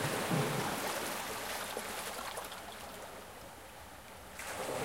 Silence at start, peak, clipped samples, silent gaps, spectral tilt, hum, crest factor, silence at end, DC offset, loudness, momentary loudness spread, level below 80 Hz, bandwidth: 0 s; -20 dBFS; under 0.1%; none; -3.5 dB/octave; none; 18 dB; 0 s; under 0.1%; -38 LUFS; 17 LU; -64 dBFS; 16.5 kHz